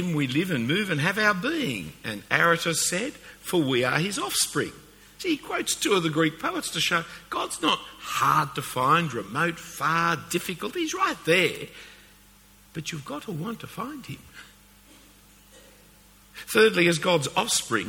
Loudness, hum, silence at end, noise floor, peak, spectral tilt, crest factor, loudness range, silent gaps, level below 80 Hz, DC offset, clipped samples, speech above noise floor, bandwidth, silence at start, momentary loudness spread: -25 LUFS; 50 Hz at -60 dBFS; 0 s; -54 dBFS; -4 dBFS; -3.5 dB/octave; 22 dB; 13 LU; none; -60 dBFS; under 0.1%; under 0.1%; 29 dB; 19.5 kHz; 0 s; 14 LU